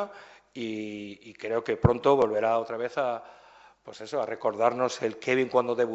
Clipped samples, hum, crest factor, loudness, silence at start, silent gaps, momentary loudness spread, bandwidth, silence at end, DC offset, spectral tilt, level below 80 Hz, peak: under 0.1%; none; 24 dB; -27 LUFS; 0 s; none; 16 LU; 8.2 kHz; 0 s; under 0.1%; -6.5 dB/octave; -48 dBFS; -4 dBFS